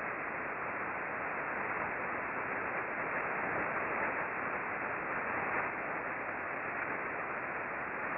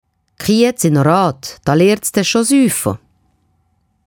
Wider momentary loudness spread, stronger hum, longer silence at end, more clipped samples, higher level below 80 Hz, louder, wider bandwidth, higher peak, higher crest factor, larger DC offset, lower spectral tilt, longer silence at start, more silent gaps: second, 3 LU vs 10 LU; neither; second, 0 s vs 1.1 s; neither; second, -68 dBFS vs -50 dBFS; second, -36 LUFS vs -14 LUFS; second, 5.6 kHz vs 18 kHz; second, -22 dBFS vs 0 dBFS; about the same, 16 dB vs 14 dB; neither; about the same, -4.5 dB/octave vs -5 dB/octave; second, 0 s vs 0.4 s; neither